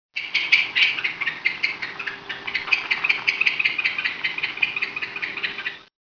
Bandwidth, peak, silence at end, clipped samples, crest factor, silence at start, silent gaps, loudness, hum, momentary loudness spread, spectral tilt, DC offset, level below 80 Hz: 5.4 kHz; -2 dBFS; 0.2 s; under 0.1%; 22 dB; 0.15 s; none; -22 LUFS; none; 11 LU; -1 dB/octave; under 0.1%; -66 dBFS